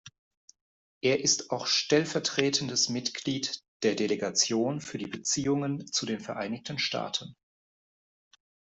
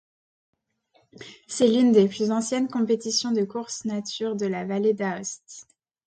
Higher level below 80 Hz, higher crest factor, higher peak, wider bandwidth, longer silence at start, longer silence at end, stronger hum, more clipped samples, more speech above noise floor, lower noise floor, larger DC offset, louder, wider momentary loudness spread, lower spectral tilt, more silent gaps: about the same, -70 dBFS vs -70 dBFS; first, 26 dB vs 20 dB; about the same, -6 dBFS vs -6 dBFS; second, 8.2 kHz vs 9.4 kHz; second, 0.05 s vs 1.2 s; first, 1.4 s vs 0.45 s; neither; neither; first, over 61 dB vs 42 dB; first, under -90 dBFS vs -66 dBFS; neither; second, -29 LUFS vs -24 LUFS; second, 9 LU vs 18 LU; second, -3 dB/octave vs -4.5 dB/octave; first, 0.18-0.31 s, 0.37-0.48 s, 0.61-1.01 s, 3.68-3.80 s vs none